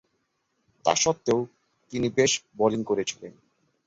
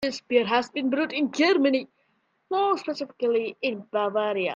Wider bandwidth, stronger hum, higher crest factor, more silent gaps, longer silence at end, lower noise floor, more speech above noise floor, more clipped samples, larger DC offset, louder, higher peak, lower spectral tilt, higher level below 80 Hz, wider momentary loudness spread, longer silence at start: about the same, 8 kHz vs 7.6 kHz; neither; about the same, 20 dB vs 18 dB; neither; first, 0.55 s vs 0 s; first, -75 dBFS vs -70 dBFS; first, 49 dB vs 45 dB; neither; neither; about the same, -25 LUFS vs -25 LUFS; about the same, -6 dBFS vs -8 dBFS; about the same, -3.5 dB/octave vs -4.5 dB/octave; first, -62 dBFS vs -72 dBFS; first, 14 LU vs 7 LU; first, 0.85 s vs 0 s